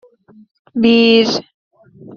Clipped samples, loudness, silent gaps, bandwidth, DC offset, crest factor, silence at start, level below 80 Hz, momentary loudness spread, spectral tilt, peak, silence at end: under 0.1%; -12 LUFS; 1.54-1.71 s; 7 kHz; under 0.1%; 14 dB; 0.75 s; -58 dBFS; 13 LU; -4.5 dB/octave; -2 dBFS; 0 s